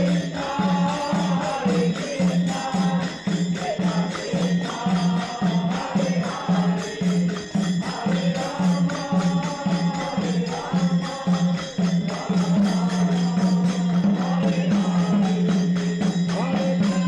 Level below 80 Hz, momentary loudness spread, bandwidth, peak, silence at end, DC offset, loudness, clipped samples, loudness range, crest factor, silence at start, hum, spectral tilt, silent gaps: -56 dBFS; 4 LU; 10 kHz; -12 dBFS; 0 s; under 0.1%; -23 LUFS; under 0.1%; 2 LU; 10 dB; 0 s; none; -6.5 dB/octave; none